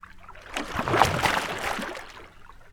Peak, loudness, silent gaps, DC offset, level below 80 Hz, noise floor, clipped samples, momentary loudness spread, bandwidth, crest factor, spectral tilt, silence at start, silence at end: 0 dBFS; -26 LUFS; none; under 0.1%; -46 dBFS; -47 dBFS; under 0.1%; 24 LU; over 20 kHz; 28 dB; -3.5 dB/octave; 0.05 s; 0 s